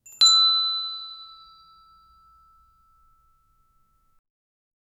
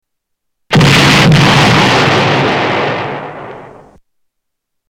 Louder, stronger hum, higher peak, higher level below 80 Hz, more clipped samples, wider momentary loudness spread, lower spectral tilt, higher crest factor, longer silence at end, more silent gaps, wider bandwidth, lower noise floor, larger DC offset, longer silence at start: second, -17 LUFS vs -8 LUFS; neither; second, -4 dBFS vs 0 dBFS; second, -68 dBFS vs -34 dBFS; neither; first, 24 LU vs 17 LU; second, 4 dB/octave vs -5 dB/octave; first, 24 dB vs 10 dB; first, 3.7 s vs 1.25 s; neither; about the same, 15.5 kHz vs 16.5 kHz; second, -64 dBFS vs -72 dBFS; neither; second, 0.2 s vs 0.7 s